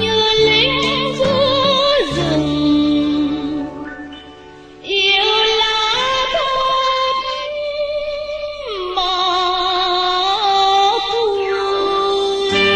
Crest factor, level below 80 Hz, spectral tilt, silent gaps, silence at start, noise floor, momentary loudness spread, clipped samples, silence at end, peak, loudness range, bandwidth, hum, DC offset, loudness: 14 dB; -42 dBFS; -4 dB/octave; none; 0 s; -38 dBFS; 11 LU; under 0.1%; 0 s; -2 dBFS; 4 LU; 9.6 kHz; none; under 0.1%; -15 LUFS